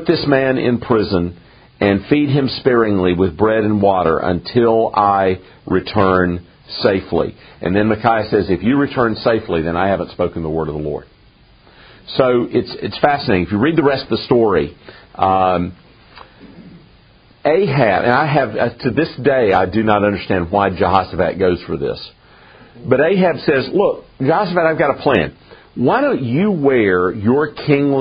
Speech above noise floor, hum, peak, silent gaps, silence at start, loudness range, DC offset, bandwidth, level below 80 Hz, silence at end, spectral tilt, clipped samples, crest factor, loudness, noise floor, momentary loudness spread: 33 dB; none; 0 dBFS; none; 0 s; 4 LU; under 0.1%; 5.2 kHz; -44 dBFS; 0 s; -5 dB/octave; under 0.1%; 16 dB; -16 LUFS; -48 dBFS; 7 LU